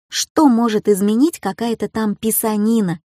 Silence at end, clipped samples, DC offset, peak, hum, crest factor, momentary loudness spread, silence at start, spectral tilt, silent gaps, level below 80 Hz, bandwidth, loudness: 0.2 s; under 0.1%; under 0.1%; -2 dBFS; none; 16 dB; 8 LU; 0.1 s; -4.5 dB/octave; 0.30-0.35 s; -56 dBFS; 15.5 kHz; -17 LUFS